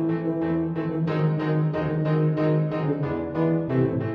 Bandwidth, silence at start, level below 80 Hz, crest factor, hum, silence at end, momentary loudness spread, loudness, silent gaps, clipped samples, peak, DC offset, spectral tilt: 5.2 kHz; 0 s; -52 dBFS; 12 dB; none; 0 s; 3 LU; -24 LUFS; none; under 0.1%; -12 dBFS; under 0.1%; -10.5 dB/octave